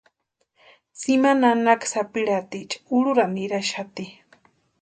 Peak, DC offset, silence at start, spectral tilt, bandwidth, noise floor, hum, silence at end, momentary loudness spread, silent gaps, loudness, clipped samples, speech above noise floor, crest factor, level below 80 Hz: -4 dBFS; under 0.1%; 0.95 s; -4 dB/octave; 9.4 kHz; -73 dBFS; none; 0.7 s; 14 LU; none; -22 LUFS; under 0.1%; 51 dB; 20 dB; -72 dBFS